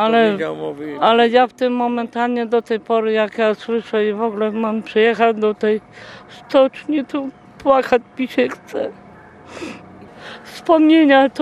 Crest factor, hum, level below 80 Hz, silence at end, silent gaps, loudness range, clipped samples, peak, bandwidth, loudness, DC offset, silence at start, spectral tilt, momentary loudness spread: 16 dB; none; -60 dBFS; 0 s; none; 4 LU; under 0.1%; -2 dBFS; 11 kHz; -17 LUFS; under 0.1%; 0 s; -6 dB/octave; 20 LU